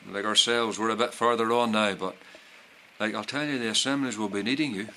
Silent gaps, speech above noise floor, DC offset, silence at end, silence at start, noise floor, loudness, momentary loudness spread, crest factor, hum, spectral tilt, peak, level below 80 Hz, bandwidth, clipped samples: none; 26 dB; under 0.1%; 0 s; 0.05 s; -53 dBFS; -26 LUFS; 9 LU; 20 dB; none; -3 dB/octave; -8 dBFS; -70 dBFS; 14 kHz; under 0.1%